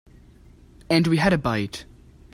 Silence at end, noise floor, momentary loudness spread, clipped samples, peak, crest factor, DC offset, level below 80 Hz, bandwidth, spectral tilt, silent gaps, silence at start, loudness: 0.5 s; -50 dBFS; 13 LU; under 0.1%; -6 dBFS; 20 dB; under 0.1%; -46 dBFS; 14 kHz; -6 dB/octave; none; 0.9 s; -22 LUFS